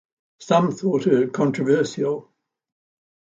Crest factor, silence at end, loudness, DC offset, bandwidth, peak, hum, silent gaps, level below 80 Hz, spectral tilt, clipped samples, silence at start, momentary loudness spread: 18 dB; 1.15 s; -21 LUFS; under 0.1%; 7.8 kHz; -4 dBFS; none; none; -68 dBFS; -6.5 dB/octave; under 0.1%; 0.4 s; 6 LU